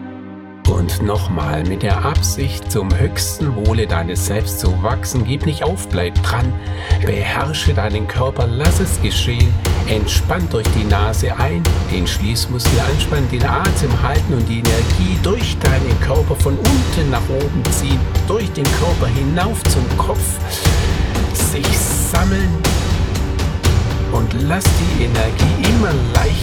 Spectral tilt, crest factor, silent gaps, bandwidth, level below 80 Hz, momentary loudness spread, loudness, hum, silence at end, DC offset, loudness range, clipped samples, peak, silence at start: -5 dB/octave; 16 dB; none; 18 kHz; -22 dBFS; 4 LU; -17 LUFS; none; 0 s; under 0.1%; 2 LU; under 0.1%; 0 dBFS; 0 s